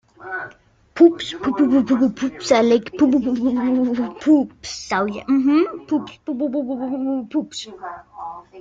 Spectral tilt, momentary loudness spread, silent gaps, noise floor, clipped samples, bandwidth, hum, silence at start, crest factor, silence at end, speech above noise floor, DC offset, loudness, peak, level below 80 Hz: -5 dB/octave; 17 LU; none; -48 dBFS; under 0.1%; 7.8 kHz; none; 0.2 s; 18 dB; 0 s; 29 dB; under 0.1%; -19 LUFS; -2 dBFS; -56 dBFS